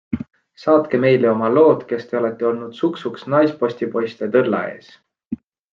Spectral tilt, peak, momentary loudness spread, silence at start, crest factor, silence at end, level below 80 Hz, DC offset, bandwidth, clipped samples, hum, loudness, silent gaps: -8.5 dB/octave; -2 dBFS; 15 LU; 0.1 s; 16 dB; 0.4 s; -60 dBFS; under 0.1%; 6.8 kHz; under 0.1%; none; -18 LUFS; 5.27-5.31 s